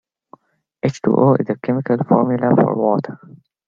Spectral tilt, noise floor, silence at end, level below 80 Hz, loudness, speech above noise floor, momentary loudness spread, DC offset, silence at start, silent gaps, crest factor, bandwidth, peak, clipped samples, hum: -9 dB/octave; -49 dBFS; 0.5 s; -58 dBFS; -17 LUFS; 33 dB; 8 LU; under 0.1%; 0.85 s; none; 16 dB; 7.4 kHz; -2 dBFS; under 0.1%; none